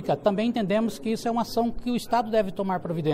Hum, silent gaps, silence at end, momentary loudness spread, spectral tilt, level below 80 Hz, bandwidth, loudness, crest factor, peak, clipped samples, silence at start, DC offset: none; none; 0 s; 4 LU; -6.5 dB/octave; -48 dBFS; 15.5 kHz; -26 LUFS; 16 dB; -8 dBFS; under 0.1%; 0 s; under 0.1%